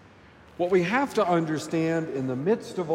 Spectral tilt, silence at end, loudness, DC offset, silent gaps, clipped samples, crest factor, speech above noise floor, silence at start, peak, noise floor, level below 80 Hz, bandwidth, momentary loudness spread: -6.5 dB/octave; 0 s; -26 LUFS; under 0.1%; none; under 0.1%; 14 dB; 27 dB; 0.6 s; -12 dBFS; -52 dBFS; -66 dBFS; 16 kHz; 5 LU